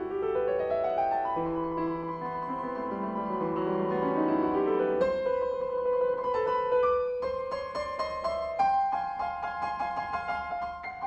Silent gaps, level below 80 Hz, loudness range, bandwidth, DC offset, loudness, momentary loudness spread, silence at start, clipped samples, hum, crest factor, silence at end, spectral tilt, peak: none; -58 dBFS; 3 LU; 8.4 kHz; under 0.1%; -30 LUFS; 7 LU; 0 s; under 0.1%; none; 16 dB; 0 s; -7.5 dB/octave; -14 dBFS